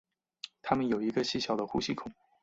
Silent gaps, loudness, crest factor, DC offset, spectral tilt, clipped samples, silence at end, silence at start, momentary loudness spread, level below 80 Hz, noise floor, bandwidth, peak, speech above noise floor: none; -32 LUFS; 22 dB; under 0.1%; -5 dB/octave; under 0.1%; 0.3 s; 0.45 s; 17 LU; -64 dBFS; -51 dBFS; 8 kHz; -12 dBFS; 19 dB